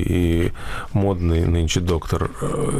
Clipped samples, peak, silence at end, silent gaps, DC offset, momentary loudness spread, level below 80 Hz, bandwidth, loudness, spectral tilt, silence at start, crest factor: under 0.1%; -8 dBFS; 0 s; none; under 0.1%; 6 LU; -28 dBFS; 14.5 kHz; -21 LUFS; -6 dB/octave; 0 s; 12 dB